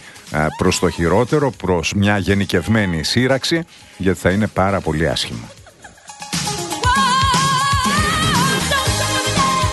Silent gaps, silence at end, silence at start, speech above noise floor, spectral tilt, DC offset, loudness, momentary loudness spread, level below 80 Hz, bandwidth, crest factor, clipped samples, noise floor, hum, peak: none; 0 s; 0 s; 25 dB; -4 dB/octave; under 0.1%; -17 LUFS; 7 LU; -34 dBFS; 12.5 kHz; 16 dB; under 0.1%; -42 dBFS; none; -2 dBFS